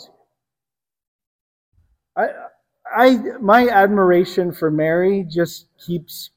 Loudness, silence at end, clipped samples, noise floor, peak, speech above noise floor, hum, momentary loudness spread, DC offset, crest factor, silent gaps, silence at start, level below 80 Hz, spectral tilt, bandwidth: -17 LUFS; 0.1 s; under 0.1%; -90 dBFS; 0 dBFS; 73 dB; none; 14 LU; under 0.1%; 18 dB; none; 2.15 s; -58 dBFS; -6.5 dB/octave; 16.5 kHz